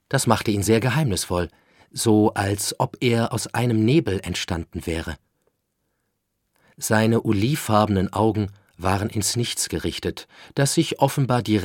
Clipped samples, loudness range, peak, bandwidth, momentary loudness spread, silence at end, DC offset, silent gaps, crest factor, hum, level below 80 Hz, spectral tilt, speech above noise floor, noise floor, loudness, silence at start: under 0.1%; 4 LU; 0 dBFS; 17.5 kHz; 10 LU; 0 s; under 0.1%; none; 22 dB; none; -48 dBFS; -5 dB/octave; 53 dB; -75 dBFS; -22 LUFS; 0.1 s